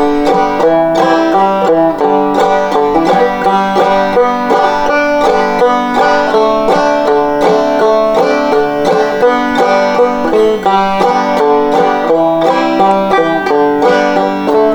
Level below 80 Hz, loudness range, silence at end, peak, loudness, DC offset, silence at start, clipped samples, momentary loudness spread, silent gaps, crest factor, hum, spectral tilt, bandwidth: -38 dBFS; 0 LU; 0 s; 0 dBFS; -10 LUFS; under 0.1%; 0 s; under 0.1%; 1 LU; none; 10 dB; none; -5.5 dB/octave; 19.5 kHz